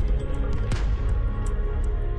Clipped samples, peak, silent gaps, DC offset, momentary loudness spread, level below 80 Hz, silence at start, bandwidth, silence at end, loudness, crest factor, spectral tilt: under 0.1%; -16 dBFS; none; under 0.1%; 2 LU; -24 dBFS; 0 s; 10 kHz; 0 s; -28 LUFS; 8 dB; -7 dB/octave